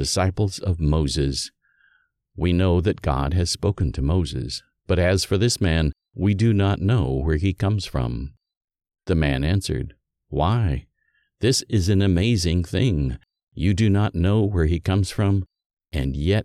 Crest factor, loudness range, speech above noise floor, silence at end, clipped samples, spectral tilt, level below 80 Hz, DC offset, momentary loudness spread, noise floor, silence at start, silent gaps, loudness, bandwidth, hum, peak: 16 dB; 4 LU; 48 dB; 0 s; under 0.1%; -6 dB/octave; -32 dBFS; under 0.1%; 9 LU; -69 dBFS; 0 s; 8.57-8.68 s, 13.43-13.47 s, 15.66-15.77 s; -22 LUFS; 13 kHz; none; -6 dBFS